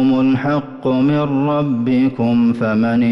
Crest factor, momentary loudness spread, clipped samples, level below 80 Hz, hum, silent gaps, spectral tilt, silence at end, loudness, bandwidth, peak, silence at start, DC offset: 8 dB; 3 LU; under 0.1%; -50 dBFS; none; none; -9 dB/octave; 0 s; -16 LUFS; 5.8 kHz; -8 dBFS; 0 s; under 0.1%